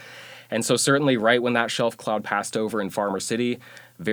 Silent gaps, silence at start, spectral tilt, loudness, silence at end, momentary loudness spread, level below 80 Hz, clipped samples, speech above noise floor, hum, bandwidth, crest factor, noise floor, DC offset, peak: none; 0 s; -4 dB/octave; -23 LUFS; 0 s; 11 LU; -70 dBFS; under 0.1%; 20 dB; none; over 20 kHz; 20 dB; -43 dBFS; under 0.1%; -4 dBFS